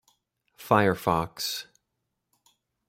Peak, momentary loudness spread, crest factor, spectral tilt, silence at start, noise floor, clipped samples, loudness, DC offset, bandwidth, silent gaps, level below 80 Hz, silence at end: -6 dBFS; 13 LU; 24 dB; -5 dB/octave; 0.6 s; -81 dBFS; under 0.1%; -26 LUFS; under 0.1%; 16 kHz; none; -60 dBFS; 1.25 s